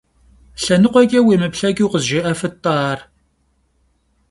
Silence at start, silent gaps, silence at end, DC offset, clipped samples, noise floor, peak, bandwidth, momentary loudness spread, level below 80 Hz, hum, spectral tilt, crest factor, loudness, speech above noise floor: 0.6 s; none; 1.3 s; under 0.1%; under 0.1%; -62 dBFS; 0 dBFS; 11.5 kHz; 10 LU; -50 dBFS; none; -5.5 dB/octave; 18 dB; -16 LUFS; 47 dB